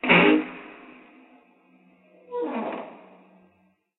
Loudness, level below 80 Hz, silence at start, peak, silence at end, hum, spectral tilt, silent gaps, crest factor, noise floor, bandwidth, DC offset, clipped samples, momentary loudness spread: -23 LUFS; -64 dBFS; 0.05 s; -4 dBFS; 1.05 s; none; -3 dB/octave; none; 24 dB; -65 dBFS; 4.1 kHz; under 0.1%; under 0.1%; 27 LU